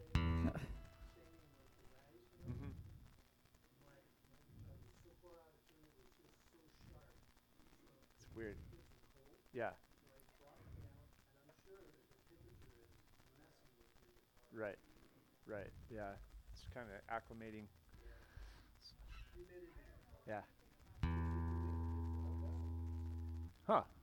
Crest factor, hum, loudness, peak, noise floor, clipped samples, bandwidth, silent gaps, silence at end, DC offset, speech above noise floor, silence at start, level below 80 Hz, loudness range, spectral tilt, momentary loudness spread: 28 dB; none; -47 LUFS; -22 dBFS; -72 dBFS; under 0.1%; 19 kHz; none; 0 s; under 0.1%; 25 dB; 0 s; -56 dBFS; 20 LU; -7.5 dB/octave; 26 LU